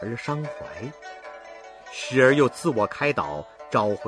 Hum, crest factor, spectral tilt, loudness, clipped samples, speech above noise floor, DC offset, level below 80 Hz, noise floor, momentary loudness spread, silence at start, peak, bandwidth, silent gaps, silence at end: none; 20 dB; -5.5 dB/octave; -23 LUFS; under 0.1%; 19 dB; under 0.1%; -60 dBFS; -43 dBFS; 22 LU; 0 s; -4 dBFS; 11 kHz; none; 0 s